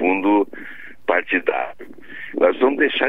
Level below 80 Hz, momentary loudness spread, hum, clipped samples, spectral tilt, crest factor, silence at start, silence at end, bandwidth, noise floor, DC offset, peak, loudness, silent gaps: -64 dBFS; 19 LU; none; under 0.1%; -6.5 dB/octave; 18 dB; 0 s; 0 s; 4 kHz; -39 dBFS; 1%; -2 dBFS; -20 LUFS; none